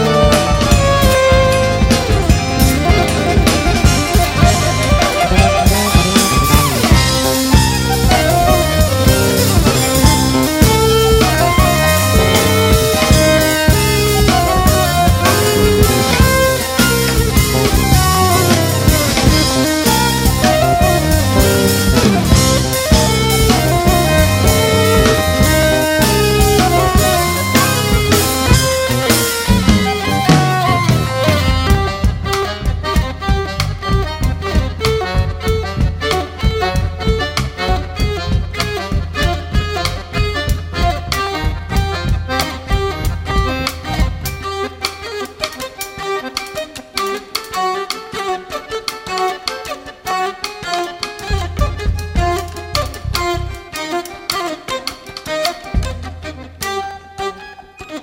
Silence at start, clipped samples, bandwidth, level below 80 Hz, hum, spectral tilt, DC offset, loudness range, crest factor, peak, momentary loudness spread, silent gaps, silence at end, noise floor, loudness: 0 s; under 0.1%; 16.5 kHz; -20 dBFS; none; -4.5 dB/octave; under 0.1%; 10 LU; 14 dB; 0 dBFS; 11 LU; none; 0 s; -35 dBFS; -14 LUFS